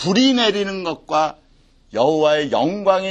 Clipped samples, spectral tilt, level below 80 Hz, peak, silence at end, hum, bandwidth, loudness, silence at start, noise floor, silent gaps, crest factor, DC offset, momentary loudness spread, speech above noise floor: under 0.1%; -4.5 dB/octave; -54 dBFS; -2 dBFS; 0 s; none; 8.8 kHz; -18 LUFS; 0 s; -53 dBFS; none; 16 dB; under 0.1%; 9 LU; 36 dB